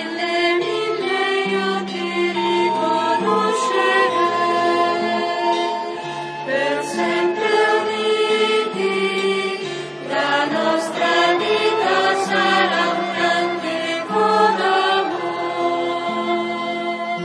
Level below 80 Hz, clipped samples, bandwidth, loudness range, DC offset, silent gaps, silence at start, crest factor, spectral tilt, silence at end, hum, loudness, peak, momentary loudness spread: -76 dBFS; under 0.1%; 11 kHz; 2 LU; under 0.1%; none; 0 s; 16 dB; -4 dB/octave; 0 s; none; -19 LUFS; -4 dBFS; 7 LU